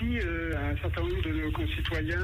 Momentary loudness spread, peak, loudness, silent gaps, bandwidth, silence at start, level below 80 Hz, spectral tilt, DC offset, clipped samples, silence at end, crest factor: 1 LU; -18 dBFS; -31 LUFS; none; 15.5 kHz; 0 s; -34 dBFS; -7 dB/octave; under 0.1%; under 0.1%; 0 s; 10 dB